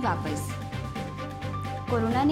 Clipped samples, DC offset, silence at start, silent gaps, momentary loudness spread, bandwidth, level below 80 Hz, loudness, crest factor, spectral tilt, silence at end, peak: under 0.1%; under 0.1%; 0 s; none; 9 LU; 16 kHz; -48 dBFS; -31 LUFS; 14 dB; -6.5 dB/octave; 0 s; -14 dBFS